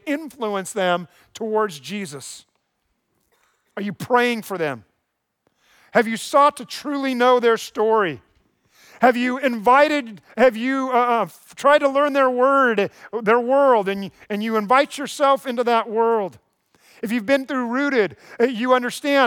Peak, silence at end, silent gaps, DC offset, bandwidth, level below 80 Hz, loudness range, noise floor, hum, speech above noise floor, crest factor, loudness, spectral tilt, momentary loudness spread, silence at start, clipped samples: -4 dBFS; 0 s; none; under 0.1%; 19 kHz; -70 dBFS; 8 LU; -75 dBFS; none; 56 dB; 16 dB; -20 LUFS; -4.5 dB/octave; 14 LU; 0.05 s; under 0.1%